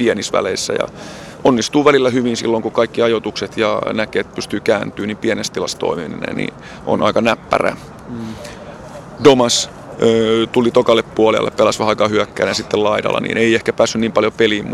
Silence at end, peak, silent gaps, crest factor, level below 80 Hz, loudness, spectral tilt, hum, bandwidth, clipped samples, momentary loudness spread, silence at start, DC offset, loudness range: 0 s; 0 dBFS; none; 16 dB; -48 dBFS; -16 LUFS; -4 dB/octave; none; 13 kHz; under 0.1%; 14 LU; 0 s; under 0.1%; 5 LU